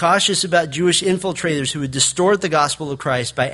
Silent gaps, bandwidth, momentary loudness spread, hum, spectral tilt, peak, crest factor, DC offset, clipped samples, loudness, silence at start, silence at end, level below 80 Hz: none; 11.5 kHz; 6 LU; none; -3 dB/octave; -2 dBFS; 16 dB; under 0.1%; under 0.1%; -18 LUFS; 0 s; 0 s; -52 dBFS